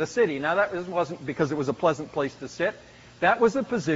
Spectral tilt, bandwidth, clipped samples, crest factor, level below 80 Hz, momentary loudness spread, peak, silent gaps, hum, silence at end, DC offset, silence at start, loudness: -4.5 dB/octave; 8 kHz; under 0.1%; 18 dB; -60 dBFS; 8 LU; -8 dBFS; none; none; 0 s; under 0.1%; 0 s; -26 LUFS